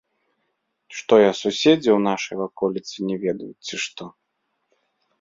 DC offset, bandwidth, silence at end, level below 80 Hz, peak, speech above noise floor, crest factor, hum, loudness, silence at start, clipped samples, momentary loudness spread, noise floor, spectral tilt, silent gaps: under 0.1%; 7.8 kHz; 1.1 s; -64 dBFS; -2 dBFS; 54 dB; 20 dB; none; -21 LUFS; 0.9 s; under 0.1%; 16 LU; -74 dBFS; -4.5 dB/octave; none